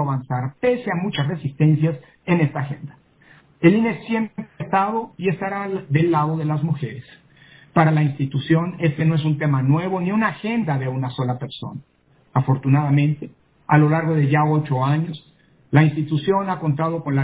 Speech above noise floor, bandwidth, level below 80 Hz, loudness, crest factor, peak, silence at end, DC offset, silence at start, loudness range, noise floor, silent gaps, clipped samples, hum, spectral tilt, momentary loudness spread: 33 dB; 4 kHz; -58 dBFS; -20 LUFS; 20 dB; 0 dBFS; 0 s; under 0.1%; 0 s; 3 LU; -52 dBFS; none; under 0.1%; none; -12 dB/octave; 12 LU